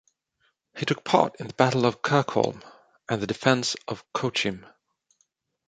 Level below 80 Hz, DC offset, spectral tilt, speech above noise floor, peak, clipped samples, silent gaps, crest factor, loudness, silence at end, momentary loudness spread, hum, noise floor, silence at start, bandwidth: -64 dBFS; under 0.1%; -5 dB/octave; 47 dB; -2 dBFS; under 0.1%; none; 24 dB; -25 LUFS; 1.05 s; 11 LU; none; -72 dBFS; 0.75 s; 9.4 kHz